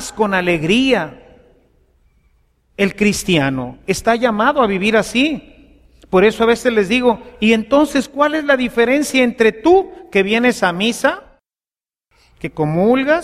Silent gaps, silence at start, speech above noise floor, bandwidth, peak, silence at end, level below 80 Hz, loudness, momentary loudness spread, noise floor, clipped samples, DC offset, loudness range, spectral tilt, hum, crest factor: none; 0 s; over 75 dB; 15 kHz; 0 dBFS; 0 s; -44 dBFS; -15 LUFS; 6 LU; under -90 dBFS; under 0.1%; under 0.1%; 4 LU; -5 dB/octave; none; 16 dB